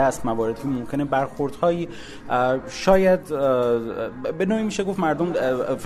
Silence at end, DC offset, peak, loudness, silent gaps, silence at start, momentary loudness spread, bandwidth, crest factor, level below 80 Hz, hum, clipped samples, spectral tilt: 0 s; under 0.1%; -4 dBFS; -23 LUFS; none; 0 s; 9 LU; 13.5 kHz; 18 dB; -46 dBFS; none; under 0.1%; -6 dB/octave